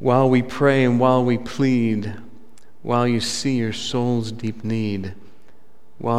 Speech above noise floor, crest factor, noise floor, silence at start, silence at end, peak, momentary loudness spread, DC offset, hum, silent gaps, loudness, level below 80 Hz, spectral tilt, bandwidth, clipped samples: 37 dB; 18 dB; -56 dBFS; 0 s; 0 s; -2 dBFS; 13 LU; 2%; none; none; -20 LUFS; -56 dBFS; -6 dB/octave; 12.5 kHz; under 0.1%